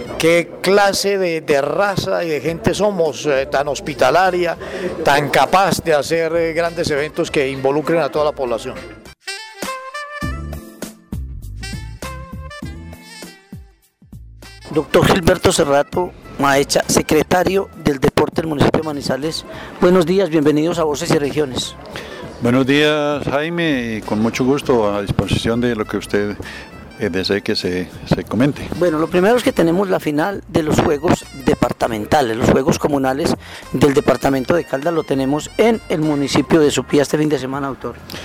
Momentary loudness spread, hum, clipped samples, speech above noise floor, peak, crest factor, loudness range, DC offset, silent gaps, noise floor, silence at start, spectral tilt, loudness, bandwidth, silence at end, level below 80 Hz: 16 LU; none; under 0.1%; 31 dB; -4 dBFS; 12 dB; 11 LU; under 0.1%; none; -48 dBFS; 0 s; -5 dB/octave; -17 LUFS; 19.5 kHz; 0 s; -38 dBFS